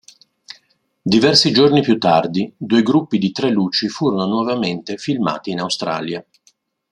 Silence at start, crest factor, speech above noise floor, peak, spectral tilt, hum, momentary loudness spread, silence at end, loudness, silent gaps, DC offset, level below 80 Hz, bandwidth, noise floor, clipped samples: 1.05 s; 18 dB; 42 dB; 0 dBFS; -5 dB/octave; none; 11 LU; 0.7 s; -17 LUFS; none; under 0.1%; -58 dBFS; 11.5 kHz; -59 dBFS; under 0.1%